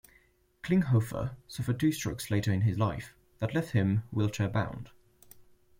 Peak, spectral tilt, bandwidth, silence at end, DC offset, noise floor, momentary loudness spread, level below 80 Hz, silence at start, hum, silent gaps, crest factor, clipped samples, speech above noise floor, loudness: -14 dBFS; -6.5 dB/octave; 16.5 kHz; 0.4 s; under 0.1%; -66 dBFS; 12 LU; -56 dBFS; 0.65 s; none; none; 18 dB; under 0.1%; 36 dB; -31 LUFS